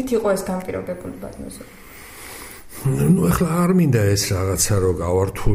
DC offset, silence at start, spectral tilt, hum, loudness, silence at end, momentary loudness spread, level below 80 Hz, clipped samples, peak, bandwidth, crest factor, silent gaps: under 0.1%; 0 s; -5.5 dB/octave; none; -19 LUFS; 0 s; 19 LU; -34 dBFS; under 0.1%; -4 dBFS; 16 kHz; 16 dB; none